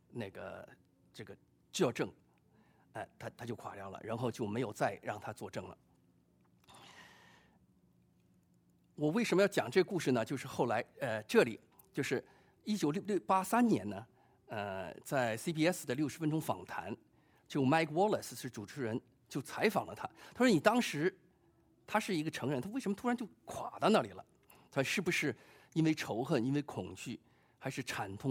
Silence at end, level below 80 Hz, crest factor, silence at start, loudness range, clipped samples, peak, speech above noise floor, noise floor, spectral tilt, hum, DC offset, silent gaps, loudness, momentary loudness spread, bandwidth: 0 s; -76 dBFS; 24 dB; 0.15 s; 8 LU; under 0.1%; -14 dBFS; 35 dB; -71 dBFS; -5.5 dB/octave; none; under 0.1%; none; -36 LUFS; 16 LU; 18 kHz